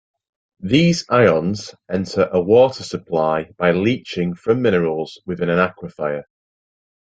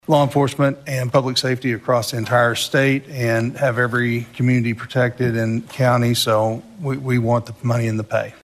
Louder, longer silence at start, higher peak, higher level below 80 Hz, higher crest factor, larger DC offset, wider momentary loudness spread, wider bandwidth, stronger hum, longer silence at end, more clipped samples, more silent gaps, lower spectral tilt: about the same, -18 LUFS vs -19 LUFS; first, 0.6 s vs 0.1 s; about the same, 0 dBFS vs -2 dBFS; about the same, -54 dBFS vs -56 dBFS; about the same, 18 dB vs 16 dB; neither; first, 12 LU vs 6 LU; second, 9 kHz vs 14.5 kHz; neither; first, 0.9 s vs 0.1 s; neither; neither; about the same, -6 dB/octave vs -5.5 dB/octave